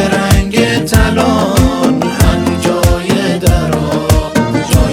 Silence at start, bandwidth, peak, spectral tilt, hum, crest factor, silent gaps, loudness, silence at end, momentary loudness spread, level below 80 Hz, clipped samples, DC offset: 0 s; 17.5 kHz; 0 dBFS; -5.5 dB/octave; none; 10 dB; none; -11 LUFS; 0 s; 3 LU; -18 dBFS; 0.9%; under 0.1%